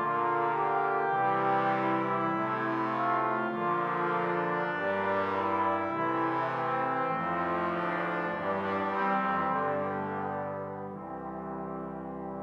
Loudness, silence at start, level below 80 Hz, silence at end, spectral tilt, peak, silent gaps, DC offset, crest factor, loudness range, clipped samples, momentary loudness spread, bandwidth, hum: -30 LUFS; 0 s; -68 dBFS; 0 s; -8 dB/octave; -16 dBFS; none; under 0.1%; 14 dB; 3 LU; under 0.1%; 10 LU; 7.4 kHz; none